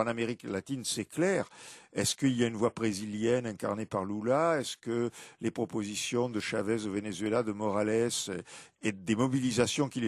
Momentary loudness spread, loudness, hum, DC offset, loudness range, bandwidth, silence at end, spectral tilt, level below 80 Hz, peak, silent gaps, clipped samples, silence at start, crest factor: 8 LU; -32 LUFS; none; under 0.1%; 2 LU; 13.5 kHz; 0 s; -4.5 dB/octave; -64 dBFS; -12 dBFS; none; under 0.1%; 0 s; 18 dB